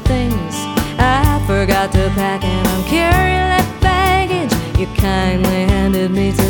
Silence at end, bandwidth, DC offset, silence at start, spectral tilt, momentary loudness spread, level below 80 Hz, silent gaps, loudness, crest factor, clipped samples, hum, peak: 0 s; over 20 kHz; under 0.1%; 0 s; -5.5 dB/octave; 5 LU; -22 dBFS; none; -15 LUFS; 14 dB; under 0.1%; none; 0 dBFS